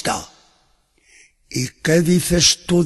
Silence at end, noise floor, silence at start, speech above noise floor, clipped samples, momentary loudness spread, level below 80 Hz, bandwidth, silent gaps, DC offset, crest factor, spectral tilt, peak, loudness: 0 s; -60 dBFS; 0 s; 43 dB; under 0.1%; 13 LU; -40 dBFS; 12.5 kHz; none; under 0.1%; 18 dB; -4 dB/octave; -2 dBFS; -17 LUFS